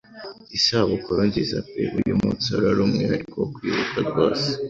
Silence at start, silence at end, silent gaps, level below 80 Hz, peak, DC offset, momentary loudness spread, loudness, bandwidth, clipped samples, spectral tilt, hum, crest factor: 0.1 s; 0 s; none; -48 dBFS; -6 dBFS; under 0.1%; 7 LU; -22 LUFS; 7.8 kHz; under 0.1%; -5.5 dB/octave; none; 16 dB